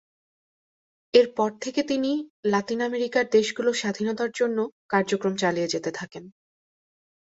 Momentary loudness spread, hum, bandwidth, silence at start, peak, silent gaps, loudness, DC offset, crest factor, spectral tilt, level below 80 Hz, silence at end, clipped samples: 8 LU; none; 8 kHz; 1.15 s; -6 dBFS; 2.30-2.43 s, 4.72-4.89 s; -25 LUFS; under 0.1%; 20 dB; -4.5 dB/octave; -70 dBFS; 1 s; under 0.1%